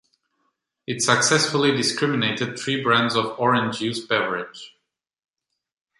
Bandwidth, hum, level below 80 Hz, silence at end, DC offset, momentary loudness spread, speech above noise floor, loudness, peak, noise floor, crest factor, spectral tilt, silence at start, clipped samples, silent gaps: 11.5 kHz; none; -66 dBFS; 1.3 s; under 0.1%; 12 LU; 60 dB; -21 LUFS; -4 dBFS; -82 dBFS; 20 dB; -3 dB/octave; 0.9 s; under 0.1%; none